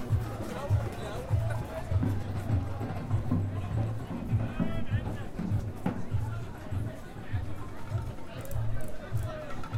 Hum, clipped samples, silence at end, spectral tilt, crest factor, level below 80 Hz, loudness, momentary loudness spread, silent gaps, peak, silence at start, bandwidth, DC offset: none; under 0.1%; 0 s; -8 dB/octave; 14 dB; -42 dBFS; -34 LUFS; 7 LU; none; -16 dBFS; 0 s; 15.5 kHz; under 0.1%